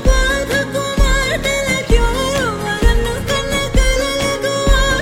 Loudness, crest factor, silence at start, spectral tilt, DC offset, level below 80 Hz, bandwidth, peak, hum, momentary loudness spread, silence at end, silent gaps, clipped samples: -16 LUFS; 14 dB; 0 s; -4 dB/octave; under 0.1%; -18 dBFS; 16 kHz; 0 dBFS; none; 3 LU; 0 s; none; under 0.1%